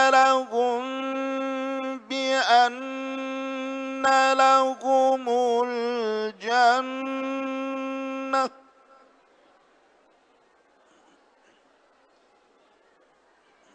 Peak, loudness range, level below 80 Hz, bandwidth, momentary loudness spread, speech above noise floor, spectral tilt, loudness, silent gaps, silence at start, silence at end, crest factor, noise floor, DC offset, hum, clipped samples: -6 dBFS; 11 LU; -78 dBFS; 10.5 kHz; 12 LU; 39 dB; -2 dB/octave; -24 LUFS; none; 0 s; 5.25 s; 18 dB; -62 dBFS; under 0.1%; none; under 0.1%